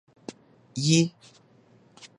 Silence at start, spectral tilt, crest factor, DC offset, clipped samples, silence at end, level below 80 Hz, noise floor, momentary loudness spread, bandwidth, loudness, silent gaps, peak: 0.3 s; -4.5 dB/octave; 22 dB; under 0.1%; under 0.1%; 0.1 s; -70 dBFS; -58 dBFS; 23 LU; 11 kHz; -24 LUFS; none; -8 dBFS